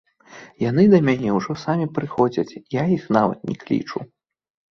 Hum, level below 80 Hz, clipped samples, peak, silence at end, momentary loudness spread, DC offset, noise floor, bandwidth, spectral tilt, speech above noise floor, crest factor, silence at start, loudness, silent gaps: none; -58 dBFS; under 0.1%; -2 dBFS; 0.65 s; 12 LU; under 0.1%; -45 dBFS; 6.6 kHz; -8 dB/octave; 25 dB; 20 dB; 0.35 s; -20 LUFS; none